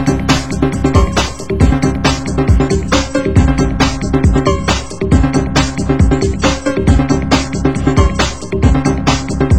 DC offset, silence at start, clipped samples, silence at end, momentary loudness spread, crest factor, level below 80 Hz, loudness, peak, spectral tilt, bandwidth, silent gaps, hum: 3%; 0 s; 0.2%; 0 s; 3 LU; 12 dB; -18 dBFS; -13 LUFS; 0 dBFS; -5.5 dB/octave; 16 kHz; none; none